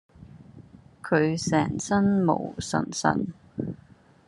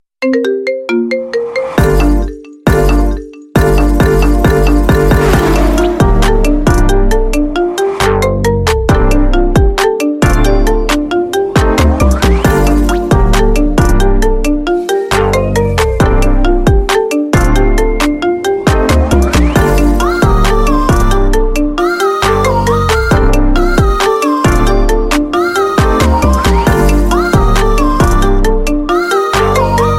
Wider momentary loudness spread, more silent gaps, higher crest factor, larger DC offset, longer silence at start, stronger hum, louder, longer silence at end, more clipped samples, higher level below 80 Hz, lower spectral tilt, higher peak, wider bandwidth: first, 13 LU vs 3 LU; neither; first, 22 dB vs 10 dB; neither; about the same, 0.2 s vs 0.2 s; neither; second, -26 LUFS vs -11 LUFS; first, 0.5 s vs 0 s; neither; second, -58 dBFS vs -12 dBFS; about the same, -5.5 dB/octave vs -6 dB/octave; second, -6 dBFS vs 0 dBFS; second, 11.5 kHz vs 15.5 kHz